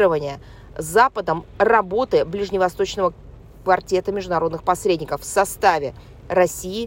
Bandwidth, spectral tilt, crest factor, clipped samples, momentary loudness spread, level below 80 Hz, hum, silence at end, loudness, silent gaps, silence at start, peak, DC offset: 16.5 kHz; -4.5 dB/octave; 18 dB; under 0.1%; 8 LU; -44 dBFS; none; 0 s; -20 LUFS; none; 0 s; -4 dBFS; under 0.1%